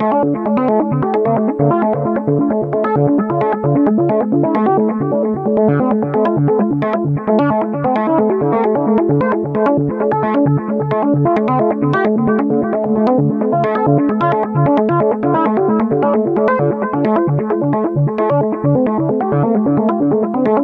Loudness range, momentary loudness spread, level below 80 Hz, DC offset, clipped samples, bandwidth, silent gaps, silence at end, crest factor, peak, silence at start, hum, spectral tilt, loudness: 1 LU; 3 LU; -52 dBFS; under 0.1%; under 0.1%; 4.9 kHz; none; 0 s; 12 dB; -2 dBFS; 0 s; none; -11 dB/octave; -15 LUFS